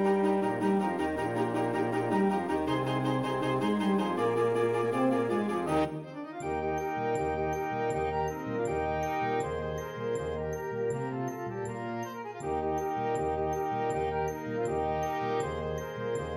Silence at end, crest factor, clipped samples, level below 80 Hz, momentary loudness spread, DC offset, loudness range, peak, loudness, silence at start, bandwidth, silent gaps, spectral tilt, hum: 0 s; 14 dB; under 0.1%; -52 dBFS; 7 LU; under 0.1%; 5 LU; -16 dBFS; -31 LUFS; 0 s; 16 kHz; none; -6.5 dB/octave; none